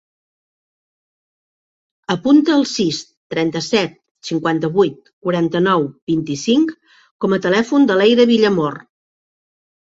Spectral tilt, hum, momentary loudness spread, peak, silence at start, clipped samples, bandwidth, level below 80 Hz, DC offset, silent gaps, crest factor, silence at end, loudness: -5.5 dB/octave; none; 12 LU; -2 dBFS; 2.1 s; under 0.1%; 7.8 kHz; -60 dBFS; under 0.1%; 3.17-3.30 s, 4.11-4.15 s, 5.13-5.21 s, 6.02-6.07 s, 7.11-7.19 s; 16 dB; 1.2 s; -17 LUFS